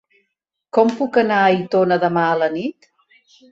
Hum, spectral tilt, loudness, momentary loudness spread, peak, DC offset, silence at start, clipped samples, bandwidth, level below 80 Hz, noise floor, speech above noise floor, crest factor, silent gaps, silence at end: none; -7 dB/octave; -17 LUFS; 6 LU; -2 dBFS; under 0.1%; 0.75 s; under 0.1%; 8 kHz; -64 dBFS; -76 dBFS; 59 dB; 16 dB; none; 0.8 s